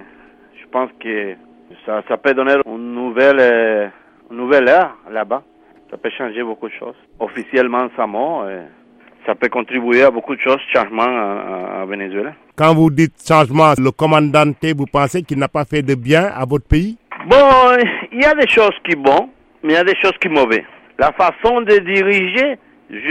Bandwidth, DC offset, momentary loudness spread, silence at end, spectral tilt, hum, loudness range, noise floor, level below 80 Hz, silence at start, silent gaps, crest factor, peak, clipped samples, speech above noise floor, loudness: 14 kHz; under 0.1%; 15 LU; 0 s; -6 dB/octave; none; 8 LU; -45 dBFS; -38 dBFS; 0.75 s; none; 14 dB; 0 dBFS; under 0.1%; 31 dB; -14 LUFS